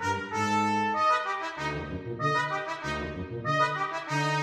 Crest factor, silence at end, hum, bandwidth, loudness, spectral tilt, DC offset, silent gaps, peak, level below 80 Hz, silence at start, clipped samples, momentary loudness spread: 14 dB; 0 s; none; 13.5 kHz; -29 LUFS; -5 dB/octave; under 0.1%; none; -14 dBFS; -52 dBFS; 0 s; under 0.1%; 8 LU